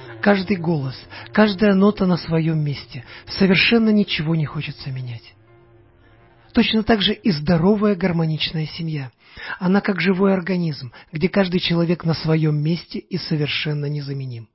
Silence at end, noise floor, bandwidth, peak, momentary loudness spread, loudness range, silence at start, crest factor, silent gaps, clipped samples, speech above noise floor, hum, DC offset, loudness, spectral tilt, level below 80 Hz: 0.1 s; -51 dBFS; 5.8 kHz; -2 dBFS; 14 LU; 4 LU; 0 s; 18 dB; none; under 0.1%; 32 dB; none; under 0.1%; -20 LUFS; -10 dB/octave; -48 dBFS